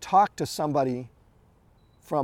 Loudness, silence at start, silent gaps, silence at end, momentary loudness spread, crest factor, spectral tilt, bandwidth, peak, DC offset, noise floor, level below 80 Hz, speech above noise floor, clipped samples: -26 LUFS; 0 s; none; 0 s; 13 LU; 18 dB; -5.5 dB/octave; 16.5 kHz; -8 dBFS; under 0.1%; -60 dBFS; -62 dBFS; 35 dB; under 0.1%